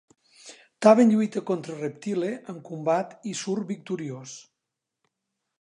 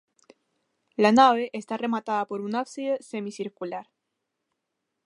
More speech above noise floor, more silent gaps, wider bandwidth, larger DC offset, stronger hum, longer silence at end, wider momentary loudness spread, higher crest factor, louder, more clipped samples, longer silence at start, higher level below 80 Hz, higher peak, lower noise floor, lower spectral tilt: about the same, 60 dB vs 57 dB; neither; about the same, 10.5 kHz vs 11.5 kHz; neither; neither; about the same, 1.2 s vs 1.25 s; about the same, 19 LU vs 17 LU; about the same, 22 dB vs 22 dB; about the same, -25 LUFS vs -25 LUFS; neither; second, 0.45 s vs 1 s; about the same, -80 dBFS vs -76 dBFS; about the same, -4 dBFS vs -4 dBFS; about the same, -85 dBFS vs -82 dBFS; about the same, -6 dB/octave vs -5 dB/octave